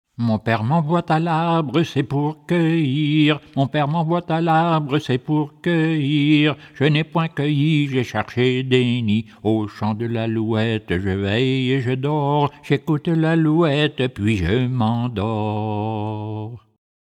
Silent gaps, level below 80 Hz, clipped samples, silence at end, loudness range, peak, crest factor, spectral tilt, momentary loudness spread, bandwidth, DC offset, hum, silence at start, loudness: none; -52 dBFS; under 0.1%; 0.45 s; 2 LU; -4 dBFS; 16 dB; -7.5 dB/octave; 6 LU; 9.2 kHz; under 0.1%; none; 0.2 s; -20 LUFS